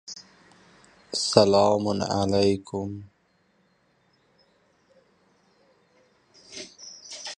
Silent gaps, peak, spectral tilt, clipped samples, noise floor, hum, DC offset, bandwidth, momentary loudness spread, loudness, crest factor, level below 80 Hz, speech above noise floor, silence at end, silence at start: none; -2 dBFS; -5 dB/octave; under 0.1%; -66 dBFS; none; under 0.1%; 11.5 kHz; 23 LU; -23 LUFS; 26 dB; -56 dBFS; 44 dB; 0.05 s; 0.1 s